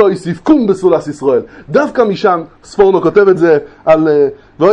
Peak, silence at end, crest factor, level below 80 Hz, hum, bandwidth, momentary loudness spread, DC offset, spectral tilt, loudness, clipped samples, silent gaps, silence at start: 0 dBFS; 0 s; 10 dB; -46 dBFS; none; 9.8 kHz; 7 LU; under 0.1%; -7 dB/octave; -11 LUFS; 0.2%; none; 0 s